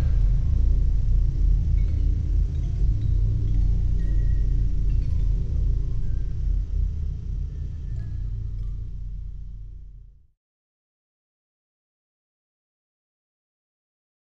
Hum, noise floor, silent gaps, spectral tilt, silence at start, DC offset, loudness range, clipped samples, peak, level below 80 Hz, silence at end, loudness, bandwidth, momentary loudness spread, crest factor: none; -45 dBFS; none; -9.5 dB/octave; 0 s; 0.3%; 14 LU; under 0.1%; -10 dBFS; -24 dBFS; 4.05 s; -27 LUFS; 2.1 kHz; 12 LU; 14 dB